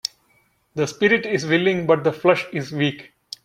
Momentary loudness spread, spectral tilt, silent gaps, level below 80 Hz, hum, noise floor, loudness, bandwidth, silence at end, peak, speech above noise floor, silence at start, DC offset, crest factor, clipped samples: 14 LU; -5.5 dB/octave; none; -62 dBFS; none; -62 dBFS; -20 LUFS; 15 kHz; 0.45 s; -2 dBFS; 42 dB; 0.75 s; under 0.1%; 20 dB; under 0.1%